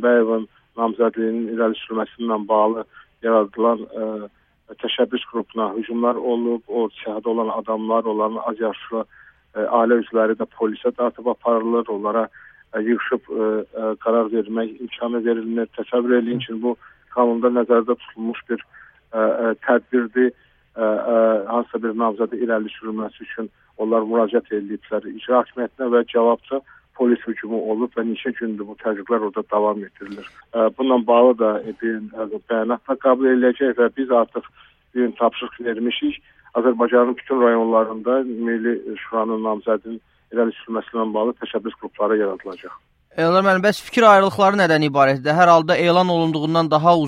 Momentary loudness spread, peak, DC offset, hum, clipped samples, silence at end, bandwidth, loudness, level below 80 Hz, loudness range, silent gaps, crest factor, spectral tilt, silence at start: 12 LU; 0 dBFS; under 0.1%; none; under 0.1%; 0 s; 12 kHz; -20 LUFS; -64 dBFS; 6 LU; none; 20 dB; -6.5 dB/octave; 0 s